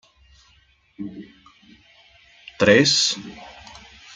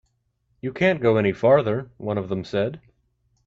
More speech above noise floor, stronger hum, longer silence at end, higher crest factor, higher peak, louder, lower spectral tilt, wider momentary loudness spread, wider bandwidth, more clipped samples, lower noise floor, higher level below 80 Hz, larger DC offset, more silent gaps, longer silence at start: second, 39 dB vs 49 dB; neither; about the same, 0.7 s vs 0.7 s; about the same, 22 dB vs 18 dB; about the same, -2 dBFS vs -4 dBFS; first, -17 LUFS vs -22 LUFS; second, -3 dB/octave vs -8 dB/octave; first, 28 LU vs 11 LU; first, 9.6 kHz vs 7.6 kHz; neither; second, -59 dBFS vs -70 dBFS; about the same, -58 dBFS vs -58 dBFS; neither; neither; first, 1 s vs 0.65 s